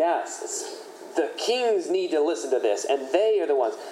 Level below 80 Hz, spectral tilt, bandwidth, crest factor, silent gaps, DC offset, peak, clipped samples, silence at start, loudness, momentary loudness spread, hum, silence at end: under -90 dBFS; -1.5 dB/octave; 14 kHz; 16 dB; none; under 0.1%; -8 dBFS; under 0.1%; 0 s; -25 LUFS; 9 LU; none; 0 s